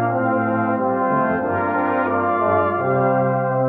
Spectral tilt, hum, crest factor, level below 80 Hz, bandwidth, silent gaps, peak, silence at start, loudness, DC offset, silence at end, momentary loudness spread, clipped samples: -11.5 dB/octave; none; 14 dB; -60 dBFS; 4.1 kHz; none; -6 dBFS; 0 s; -19 LUFS; under 0.1%; 0 s; 2 LU; under 0.1%